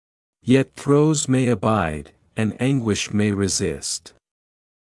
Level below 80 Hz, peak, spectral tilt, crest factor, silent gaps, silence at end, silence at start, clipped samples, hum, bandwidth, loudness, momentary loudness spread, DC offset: -50 dBFS; -4 dBFS; -5 dB/octave; 18 dB; none; 0.9 s; 0.45 s; under 0.1%; none; 12 kHz; -21 LUFS; 10 LU; under 0.1%